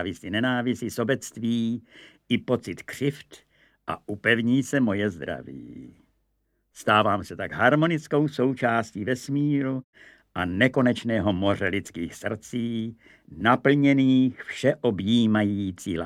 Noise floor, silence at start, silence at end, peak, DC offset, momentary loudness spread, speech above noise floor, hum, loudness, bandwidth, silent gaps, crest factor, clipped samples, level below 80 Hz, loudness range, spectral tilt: -73 dBFS; 0 s; 0 s; -4 dBFS; under 0.1%; 14 LU; 48 dB; none; -25 LUFS; 14.5 kHz; 9.84-9.93 s; 22 dB; under 0.1%; -60 dBFS; 5 LU; -6 dB/octave